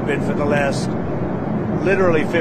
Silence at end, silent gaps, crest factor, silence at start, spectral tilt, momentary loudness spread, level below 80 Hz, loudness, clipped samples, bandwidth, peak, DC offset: 0 s; none; 14 dB; 0 s; -7 dB/octave; 7 LU; -40 dBFS; -19 LUFS; under 0.1%; 13.5 kHz; -4 dBFS; under 0.1%